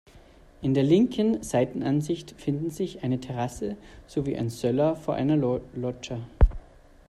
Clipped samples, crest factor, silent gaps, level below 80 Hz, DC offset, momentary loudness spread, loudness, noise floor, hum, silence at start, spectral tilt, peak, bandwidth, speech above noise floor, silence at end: under 0.1%; 20 dB; none; -34 dBFS; under 0.1%; 12 LU; -27 LUFS; -52 dBFS; none; 0.15 s; -7 dB/octave; -6 dBFS; 14 kHz; 26 dB; 0.5 s